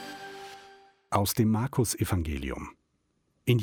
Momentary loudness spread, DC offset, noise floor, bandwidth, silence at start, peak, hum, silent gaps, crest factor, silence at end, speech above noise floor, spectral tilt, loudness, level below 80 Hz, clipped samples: 19 LU; under 0.1%; -74 dBFS; 17.5 kHz; 0 s; -10 dBFS; none; none; 20 dB; 0 s; 46 dB; -5.5 dB/octave; -29 LUFS; -46 dBFS; under 0.1%